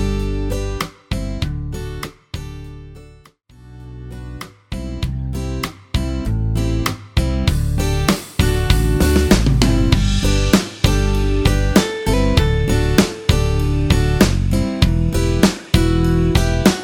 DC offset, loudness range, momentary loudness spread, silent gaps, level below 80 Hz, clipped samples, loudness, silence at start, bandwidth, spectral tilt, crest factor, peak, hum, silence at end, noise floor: under 0.1%; 13 LU; 15 LU; none; -22 dBFS; under 0.1%; -18 LUFS; 0 s; 18 kHz; -5.5 dB/octave; 16 dB; 0 dBFS; none; 0 s; -46 dBFS